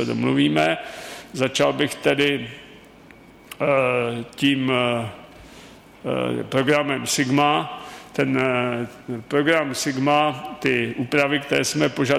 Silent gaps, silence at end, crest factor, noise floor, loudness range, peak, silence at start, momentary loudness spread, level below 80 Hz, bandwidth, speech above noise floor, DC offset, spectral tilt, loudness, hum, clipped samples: none; 0 s; 16 dB; -47 dBFS; 2 LU; -6 dBFS; 0 s; 14 LU; -58 dBFS; 15.5 kHz; 26 dB; under 0.1%; -4.5 dB/octave; -21 LUFS; none; under 0.1%